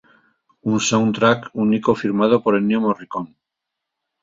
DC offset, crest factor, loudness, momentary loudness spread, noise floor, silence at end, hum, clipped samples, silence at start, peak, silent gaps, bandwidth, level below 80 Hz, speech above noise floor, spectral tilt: under 0.1%; 18 dB; -18 LUFS; 12 LU; -82 dBFS; 0.95 s; none; under 0.1%; 0.65 s; -2 dBFS; none; 7.8 kHz; -58 dBFS; 64 dB; -5 dB/octave